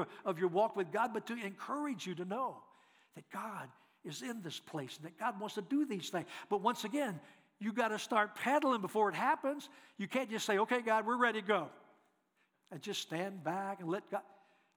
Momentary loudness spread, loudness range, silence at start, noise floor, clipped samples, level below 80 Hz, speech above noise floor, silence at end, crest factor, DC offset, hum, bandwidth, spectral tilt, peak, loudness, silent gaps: 13 LU; 9 LU; 0 s; -78 dBFS; under 0.1%; under -90 dBFS; 41 dB; 0.55 s; 22 dB; under 0.1%; none; over 20 kHz; -4.5 dB/octave; -16 dBFS; -37 LUFS; none